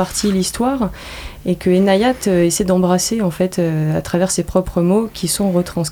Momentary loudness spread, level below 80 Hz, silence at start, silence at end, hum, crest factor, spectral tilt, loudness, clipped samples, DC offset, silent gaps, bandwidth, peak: 6 LU; -38 dBFS; 0 s; 0 s; none; 16 dB; -5 dB/octave; -17 LUFS; under 0.1%; under 0.1%; none; over 20 kHz; 0 dBFS